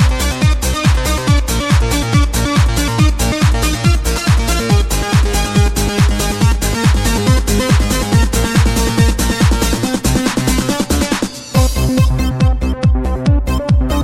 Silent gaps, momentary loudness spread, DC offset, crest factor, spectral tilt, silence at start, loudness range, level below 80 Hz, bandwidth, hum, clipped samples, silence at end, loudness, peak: none; 2 LU; under 0.1%; 12 dB; -5 dB/octave; 0 s; 1 LU; -16 dBFS; 16 kHz; none; under 0.1%; 0 s; -14 LUFS; 0 dBFS